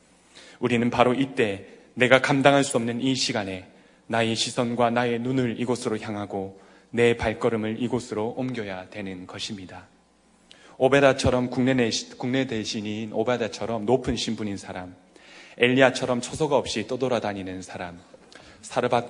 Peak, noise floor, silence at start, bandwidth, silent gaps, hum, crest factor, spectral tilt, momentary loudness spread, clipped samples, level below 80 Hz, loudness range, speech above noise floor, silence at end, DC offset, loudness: 0 dBFS; -60 dBFS; 0.35 s; 11 kHz; none; none; 24 dB; -4.5 dB/octave; 16 LU; under 0.1%; -54 dBFS; 5 LU; 35 dB; 0 s; under 0.1%; -24 LUFS